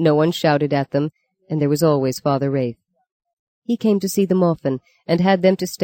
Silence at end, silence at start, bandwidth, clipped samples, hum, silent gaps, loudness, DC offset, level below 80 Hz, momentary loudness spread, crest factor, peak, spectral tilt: 0 s; 0 s; 17 kHz; under 0.1%; none; 3.12-3.20 s, 3.33-3.62 s; -19 LUFS; under 0.1%; -60 dBFS; 10 LU; 16 dB; -4 dBFS; -6.5 dB/octave